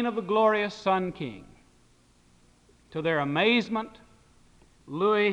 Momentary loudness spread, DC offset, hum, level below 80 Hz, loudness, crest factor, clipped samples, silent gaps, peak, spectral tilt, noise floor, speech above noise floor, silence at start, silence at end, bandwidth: 16 LU; under 0.1%; none; -62 dBFS; -26 LUFS; 18 dB; under 0.1%; none; -10 dBFS; -6 dB/octave; -61 dBFS; 35 dB; 0 s; 0 s; 9.8 kHz